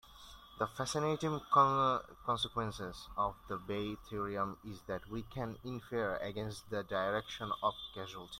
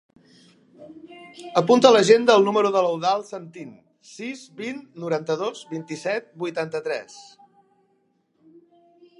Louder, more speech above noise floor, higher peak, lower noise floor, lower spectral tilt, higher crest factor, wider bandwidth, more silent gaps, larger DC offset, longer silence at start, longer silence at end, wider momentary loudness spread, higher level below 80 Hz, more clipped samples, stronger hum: second, -37 LUFS vs -21 LUFS; second, 19 dB vs 45 dB; second, -16 dBFS vs 0 dBFS; second, -56 dBFS vs -67 dBFS; about the same, -5 dB/octave vs -4.5 dB/octave; about the same, 22 dB vs 22 dB; first, 16.5 kHz vs 11 kHz; neither; neither; second, 0.05 s vs 0.8 s; second, 0 s vs 2 s; second, 14 LU vs 26 LU; first, -60 dBFS vs -76 dBFS; neither; neither